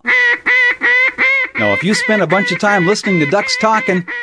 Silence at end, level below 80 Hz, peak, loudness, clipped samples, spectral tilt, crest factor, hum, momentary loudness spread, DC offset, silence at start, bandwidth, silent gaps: 0 s; -58 dBFS; 0 dBFS; -12 LUFS; under 0.1%; -4 dB/octave; 14 dB; none; 4 LU; under 0.1%; 0.05 s; 11 kHz; none